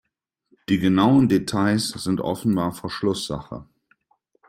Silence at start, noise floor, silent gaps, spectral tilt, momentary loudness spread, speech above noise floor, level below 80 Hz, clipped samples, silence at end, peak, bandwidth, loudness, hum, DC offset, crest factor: 0.7 s; -70 dBFS; none; -6 dB/octave; 15 LU; 49 dB; -54 dBFS; under 0.1%; 0.85 s; -6 dBFS; 16 kHz; -22 LUFS; none; under 0.1%; 18 dB